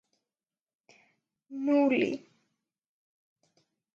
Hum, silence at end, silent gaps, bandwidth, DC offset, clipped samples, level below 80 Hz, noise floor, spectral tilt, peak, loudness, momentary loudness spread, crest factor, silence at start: none; 1.8 s; none; 7.2 kHz; under 0.1%; under 0.1%; -82 dBFS; under -90 dBFS; -6 dB/octave; -14 dBFS; -28 LUFS; 17 LU; 20 dB; 1.5 s